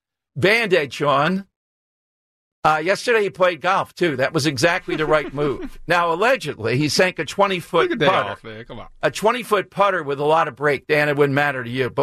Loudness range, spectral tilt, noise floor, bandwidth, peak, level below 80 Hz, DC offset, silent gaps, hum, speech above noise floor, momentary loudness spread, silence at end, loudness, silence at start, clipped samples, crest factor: 1 LU; -4.5 dB/octave; under -90 dBFS; 14 kHz; -4 dBFS; -48 dBFS; under 0.1%; 1.56-2.62 s; none; over 71 dB; 7 LU; 0 s; -19 LUFS; 0.35 s; under 0.1%; 16 dB